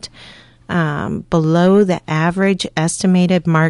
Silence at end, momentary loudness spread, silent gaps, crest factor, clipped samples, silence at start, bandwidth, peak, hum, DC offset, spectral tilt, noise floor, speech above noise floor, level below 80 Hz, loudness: 0 s; 8 LU; none; 14 dB; under 0.1%; 0.05 s; 11.5 kHz; -2 dBFS; none; under 0.1%; -6 dB/octave; -41 dBFS; 27 dB; -46 dBFS; -16 LUFS